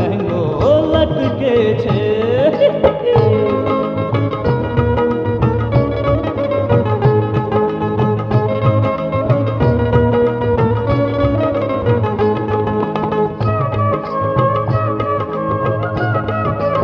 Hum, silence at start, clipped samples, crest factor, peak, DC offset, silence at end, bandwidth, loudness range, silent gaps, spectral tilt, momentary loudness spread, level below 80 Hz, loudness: none; 0 s; under 0.1%; 14 dB; 0 dBFS; under 0.1%; 0 s; 6 kHz; 3 LU; none; -9.5 dB/octave; 5 LU; -32 dBFS; -16 LUFS